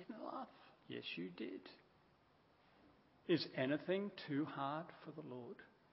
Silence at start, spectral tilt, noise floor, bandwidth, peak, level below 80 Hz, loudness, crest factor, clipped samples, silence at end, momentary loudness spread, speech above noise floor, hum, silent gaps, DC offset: 0 s; -4 dB/octave; -73 dBFS; 5.6 kHz; -24 dBFS; -86 dBFS; -44 LUFS; 22 dB; under 0.1%; 0.25 s; 17 LU; 29 dB; none; none; under 0.1%